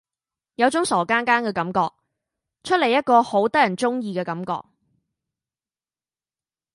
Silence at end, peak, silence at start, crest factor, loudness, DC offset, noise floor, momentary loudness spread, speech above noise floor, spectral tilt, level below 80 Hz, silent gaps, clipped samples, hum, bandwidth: 2.15 s; -2 dBFS; 0.6 s; 20 dB; -21 LUFS; under 0.1%; under -90 dBFS; 11 LU; over 70 dB; -4.5 dB/octave; -66 dBFS; none; under 0.1%; none; 11.5 kHz